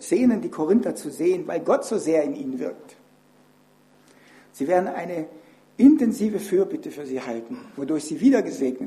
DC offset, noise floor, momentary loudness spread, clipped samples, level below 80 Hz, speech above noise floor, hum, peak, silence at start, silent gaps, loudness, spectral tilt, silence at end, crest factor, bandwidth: under 0.1%; -57 dBFS; 15 LU; under 0.1%; -66 dBFS; 35 dB; none; -4 dBFS; 0 s; none; -23 LUFS; -6 dB/octave; 0 s; 20 dB; 14 kHz